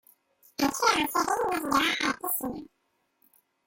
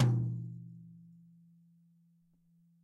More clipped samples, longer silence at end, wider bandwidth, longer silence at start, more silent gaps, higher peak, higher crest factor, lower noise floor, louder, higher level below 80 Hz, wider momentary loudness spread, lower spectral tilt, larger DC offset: neither; second, 1 s vs 1.85 s; first, 17 kHz vs 6.8 kHz; first, 0.6 s vs 0 s; neither; first, -8 dBFS vs -16 dBFS; about the same, 20 dB vs 22 dB; first, -75 dBFS vs -69 dBFS; first, -27 LUFS vs -36 LUFS; first, -62 dBFS vs -72 dBFS; second, 11 LU vs 27 LU; second, -2 dB/octave vs -8.5 dB/octave; neither